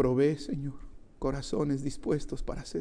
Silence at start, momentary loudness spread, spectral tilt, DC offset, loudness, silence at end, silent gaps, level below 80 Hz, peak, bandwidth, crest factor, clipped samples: 0 s; 11 LU; -7 dB/octave; under 0.1%; -32 LUFS; 0 s; none; -44 dBFS; -14 dBFS; 10.5 kHz; 16 dB; under 0.1%